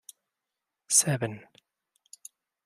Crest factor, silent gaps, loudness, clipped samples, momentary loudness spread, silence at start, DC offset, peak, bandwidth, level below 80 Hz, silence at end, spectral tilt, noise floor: 26 dB; none; -25 LUFS; under 0.1%; 26 LU; 0.9 s; under 0.1%; -8 dBFS; 15.5 kHz; -76 dBFS; 1.25 s; -2.5 dB/octave; -87 dBFS